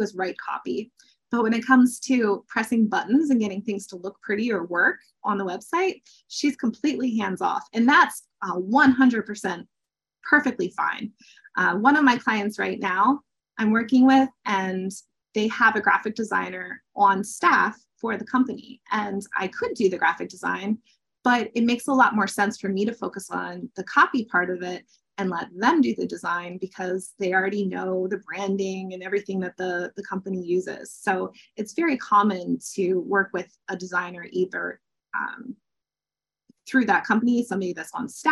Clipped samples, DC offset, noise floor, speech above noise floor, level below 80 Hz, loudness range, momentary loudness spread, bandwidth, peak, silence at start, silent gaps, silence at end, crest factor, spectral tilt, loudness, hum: under 0.1%; under 0.1%; under -90 dBFS; over 66 dB; -72 dBFS; 6 LU; 14 LU; 12.5 kHz; -4 dBFS; 0 s; none; 0 s; 20 dB; -5 dB/octave; -24 LUFS; none